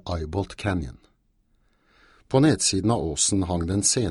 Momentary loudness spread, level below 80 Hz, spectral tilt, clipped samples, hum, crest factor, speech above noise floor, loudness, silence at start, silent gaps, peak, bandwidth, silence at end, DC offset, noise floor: 10 LU; -44 dBFS; -4 dB/octave; under 0.1%; none; 18 dB; 42 dB; -23 LUFS; 0.05 s; none; -6 dBFS; 12 kHz; 0 s; under 0.1%; -66 dBFS